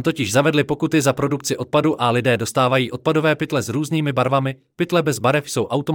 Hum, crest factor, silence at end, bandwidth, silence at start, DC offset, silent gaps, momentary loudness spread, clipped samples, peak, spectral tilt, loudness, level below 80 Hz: none; 16 dB; 0 s; 18.5 kHz; 0 s; under 0.1%; none; 4 LU; under 0.1%; -2 dBFS; -5 dB/octave; -19 LUFS; -58 dBFS